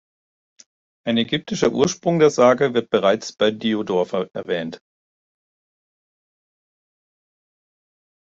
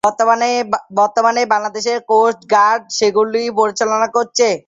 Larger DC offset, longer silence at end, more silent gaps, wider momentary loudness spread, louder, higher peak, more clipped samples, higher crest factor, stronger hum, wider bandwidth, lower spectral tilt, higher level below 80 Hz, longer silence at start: neither; first, 3.5 s vs 0.1 s; neither; first, 11 LU vs 3 LU; second, -20 LUFS vs -15 LUFS; about the same, -2 dBFS vs -2 dBFS; neither; first, 20 dB vs 14 dB; neither; about the same, 7.8 kHz vs 8.4 kHz; first, -5 dB/octave vs -2.5 dB/octave; about the same, -62 dBFS vs -62 dBFS; first, 1.05 s vs 0.05 s